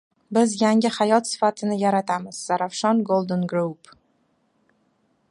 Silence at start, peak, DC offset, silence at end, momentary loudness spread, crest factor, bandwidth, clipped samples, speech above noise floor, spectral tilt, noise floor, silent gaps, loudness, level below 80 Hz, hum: 0.3 s; -4 dBFS; under 0.1%; 1.55 s; 7 LU; 18 dB; 11.5 kHz; under 0.1%; 45 dB; -5 dB/octave; -67 dBFS; none; -22 LUFS; -70 dBFS; none